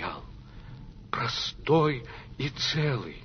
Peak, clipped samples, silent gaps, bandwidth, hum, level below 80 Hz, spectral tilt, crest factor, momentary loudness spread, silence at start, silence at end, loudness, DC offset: -12 dBFS; under 0.1%; none; 6.6 kHz; none; -50 dBFS; -5.5 dB/octave; 18 dB; 23 LU; 0 s; 0 s; -28 LUFS; under 0.1%